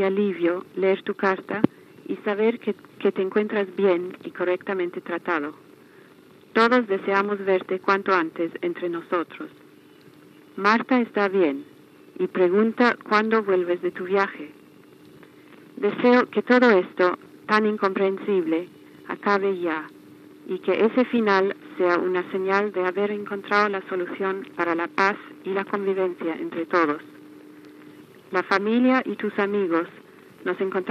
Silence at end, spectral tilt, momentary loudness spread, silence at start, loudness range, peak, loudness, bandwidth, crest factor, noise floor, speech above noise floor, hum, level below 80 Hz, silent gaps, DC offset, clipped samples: 0 s; -6.5 dB/octave; 11 LU; 0 s; 4 LU; -2 dBFS; -23 LUFS; 8.4 kHz; 22 dB; -51 dBFS; 28 dB; none; -82 dBFS; none; under 0.1%; under 0.1%